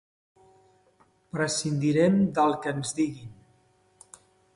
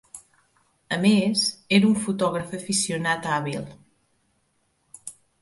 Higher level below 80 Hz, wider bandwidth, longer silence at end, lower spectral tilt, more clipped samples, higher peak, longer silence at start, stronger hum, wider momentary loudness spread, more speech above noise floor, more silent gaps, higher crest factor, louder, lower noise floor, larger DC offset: about the same, -64 dBFS vs -64 dBFS; about the same, 11.5 kHz vs 11.5 kHz; first, 1.25 s vs 0.3 s; first, -5.5 dB/octave vs -4 dB/octave; neither; second, -10 dBFS vs -6 dBFS; first, 1.35 s vs 0.15 s; neither; second, 14 LU vs 21 LU; second, 39 dB vs 47 dB; neither; about the same, 18 dB vs 20 dB; second, -26 LUFS vs -23 LUFS; second, -64 dBFS vs -69 dBFS; neither